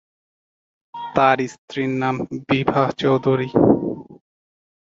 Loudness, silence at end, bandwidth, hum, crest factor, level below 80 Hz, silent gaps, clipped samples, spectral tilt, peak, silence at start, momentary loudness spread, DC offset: -20 LUFS; 0.7 s; 7.8 kHz; none; 20 dB; -52 dBFS; 1.58-1.68 s; under 0.1%; -7 dB/octave; -2 dBFS; 0.95 s; 12 LU; under 0.1%